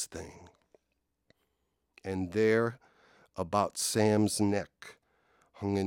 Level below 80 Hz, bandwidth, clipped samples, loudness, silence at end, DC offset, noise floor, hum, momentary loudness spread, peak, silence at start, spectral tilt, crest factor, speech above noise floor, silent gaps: -66 dBFS; 18 kHz; under 0.1%; -30 LUFS; 0 s; under 0.1%; -81 dBFS; none; 20 LU; -12 dBFS; 0 s; -5 dB/octave; 20 dB; 51 dB; none